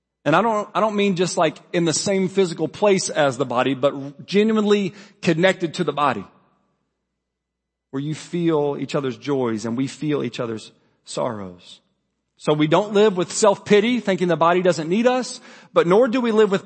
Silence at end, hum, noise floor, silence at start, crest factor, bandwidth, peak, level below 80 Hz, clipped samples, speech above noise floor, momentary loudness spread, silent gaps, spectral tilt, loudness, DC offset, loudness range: 0.05 s; none; -81 dBFS; 0.25 s; 18 dB; 8.8 kHz; -2 dBFS; -68 dBFS; under 0.1%; 61 dB; 11 LU; none; -5 dB/octave; -20 LUFS; under 0.1%; 8 LU